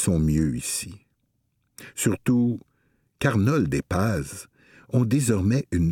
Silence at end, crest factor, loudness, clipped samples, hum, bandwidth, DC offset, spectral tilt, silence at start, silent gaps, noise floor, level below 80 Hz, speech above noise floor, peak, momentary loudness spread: 0 s; 16 dB; -24 LUFS; under 0.1%; none; 17.5 kHz; under 0.1%; -6 dB/octave; 0 s; none; -72 dBFS; -42 dBFS; 49 dB; -8 dBFS; 12 LU